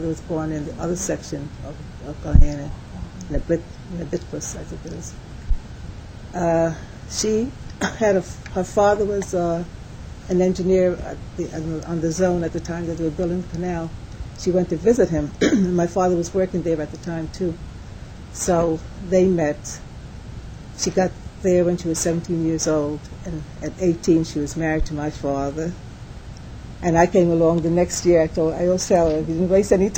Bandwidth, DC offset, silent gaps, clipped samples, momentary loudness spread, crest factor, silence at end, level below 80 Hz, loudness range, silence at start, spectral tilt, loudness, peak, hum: 16.5 kHz; under 0.1%; none; under 0.1%; 18 LU; 20 dB; 0 s; -30 dBFS; 6 LU; 0 s; -6 dB/octave; -22 LUFS; -2 dBFS; none